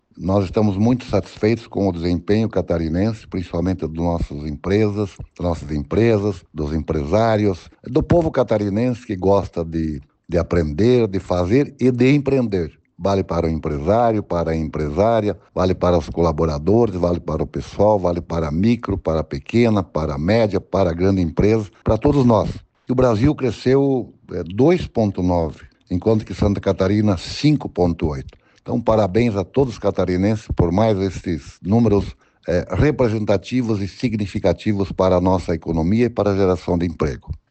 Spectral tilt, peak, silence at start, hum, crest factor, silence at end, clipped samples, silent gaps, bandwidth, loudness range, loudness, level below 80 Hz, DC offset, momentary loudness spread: -8 dB/octave; -4 dBFS; 0.15 s; none; 14 dB; 0.15 s; under 0.1%; none; 8.6 kHz; 3 LU; -19 LUFS; -36 dBFS; under 0.1%; 8 LU